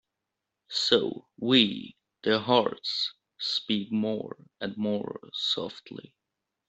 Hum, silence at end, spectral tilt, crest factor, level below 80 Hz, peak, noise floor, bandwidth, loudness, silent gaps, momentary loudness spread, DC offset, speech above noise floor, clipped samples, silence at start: none; 0.65 s; -4.5 dB/octave; 24 dB; -72 dBFS; -6 dBFS; -85 dBFS; 8.2 kHz; -28 LUFS; none; 16 LU; under 0.1%; 57 dB; under 0.1%; 0.7 s